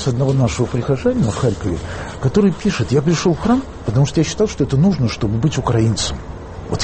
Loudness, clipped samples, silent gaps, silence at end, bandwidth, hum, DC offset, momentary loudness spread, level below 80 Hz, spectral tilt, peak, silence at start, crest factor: -17 LUFS; under 0.1%; none; 0 s; 8.8 kHz; none; under 0.1%; 8 LU; -34 dBFS; -6 dB/octave; -4 dBFS; 0 s; 14 dB